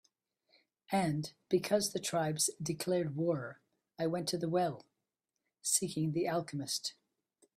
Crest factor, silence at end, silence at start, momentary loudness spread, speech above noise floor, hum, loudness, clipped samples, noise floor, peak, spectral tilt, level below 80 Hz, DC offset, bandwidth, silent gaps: 20 dB; 0.65 s; 0.9 s; 7 LU; 54 dB; none; -35 LUFS; under 0.1%; -88 dBFS; -16 dBFS; -4 dB/octave; -74 dBFS; under 0.1%; 15.5 kHz; none